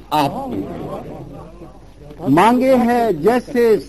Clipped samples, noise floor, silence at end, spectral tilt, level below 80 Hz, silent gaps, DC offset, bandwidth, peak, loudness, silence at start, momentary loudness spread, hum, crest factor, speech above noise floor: under 0.1%; -39 dBFS; 0 s; -6.5 dB/octave; -44 dBFS; none; 0.4%; 13 kHz; -2 dBFS; -16 LUFS; 0 s; 21 LU; none; 14 dB; 24 dB